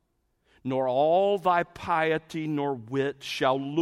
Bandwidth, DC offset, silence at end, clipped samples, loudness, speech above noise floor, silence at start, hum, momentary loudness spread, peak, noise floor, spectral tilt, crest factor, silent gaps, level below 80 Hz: 14.5 kHz; under 0.1%; 0 s; under 0.1%; -27 LUFS; 46 dB; 0.65 s; none; 8 LU; -10 dBFS; -72 dBFS; -6 dB/octave; 16 dB; none; -64 dBFS